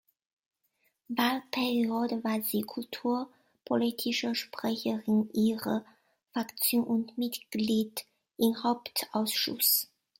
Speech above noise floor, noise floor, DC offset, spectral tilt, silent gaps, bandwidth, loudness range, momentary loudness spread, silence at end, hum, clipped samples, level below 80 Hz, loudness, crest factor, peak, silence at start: 45 dB; -75 dBFS; under 0.1%; -3.5 dB/octave; none; 16.5 kHz; 2 LU; 9 LU; 0.35 s; none; under 0.1%; -76 dBFS; -30 LUFS; 18 dB; -12 dBFS; 1.1 s